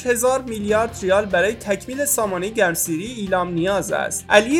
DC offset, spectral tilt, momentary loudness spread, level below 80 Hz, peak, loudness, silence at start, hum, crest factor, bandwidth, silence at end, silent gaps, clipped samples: under 0.1%; -3.5 dB/octave; 6 LU; -46 dBFS; 0 dBFS; -20 LUFS; 0 s; none; 20 dB; 18 kHz; 0 s; none; under 0.1%